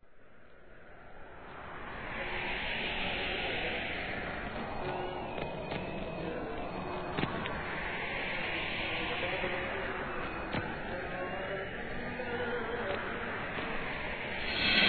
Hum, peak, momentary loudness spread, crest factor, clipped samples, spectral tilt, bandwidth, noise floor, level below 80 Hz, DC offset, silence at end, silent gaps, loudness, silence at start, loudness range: none; -14 dBFS; 6 LU; 22 dB; under 0.1%; -7 dB/octave; 4.6 kHz; -59 dBFS; -50 dBFS; 0.2%; 0 s; none; -36 LUFS; 0 s; 3 LU